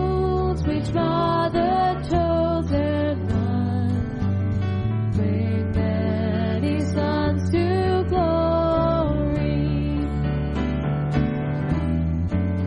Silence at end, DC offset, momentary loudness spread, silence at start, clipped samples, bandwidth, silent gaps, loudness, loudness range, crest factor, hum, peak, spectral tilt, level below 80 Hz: 0 s; under 0.1%; 4 LU; 0 s; under 0.1%; 9.8 kHz; none; -23 LUFS; 2 LU; 14 dB; none; -8 dBFS; -8.5 dB/octave; -32 dBFS